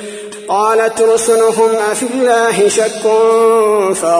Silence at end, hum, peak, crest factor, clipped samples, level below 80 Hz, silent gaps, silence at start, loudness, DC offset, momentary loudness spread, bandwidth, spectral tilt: 0 s; none; 0 dBFS; 12 dB; under 0.1%; -58 dBFS; none; 0 s; -11 LUFS; under 0.1%; 5 LU; 11 kHz; -3 dB/octave